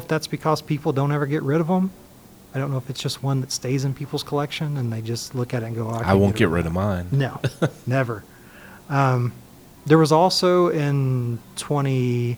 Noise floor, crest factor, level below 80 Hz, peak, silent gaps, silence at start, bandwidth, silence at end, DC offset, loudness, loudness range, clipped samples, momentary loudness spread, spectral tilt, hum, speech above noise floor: -44 dBFS; 20 dB; -52 dBFS; -2 dBFS; none; 0 s; over 20 kHz; 0 s; under 0.1%; -22 LUFS; 5 LU; under 0.1%; 10 LU; -6 dB/octave; none; 23 dB